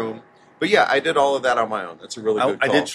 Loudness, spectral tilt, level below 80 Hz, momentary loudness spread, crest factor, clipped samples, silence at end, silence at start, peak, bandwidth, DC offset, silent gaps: -20 LUFS; -3.5 dB/octave; -62 dBFS; 13 LU; 18 dB; under 0.1%; 0 s; 0 s; -2 dBFS; 12 kHz; under 0.1%; none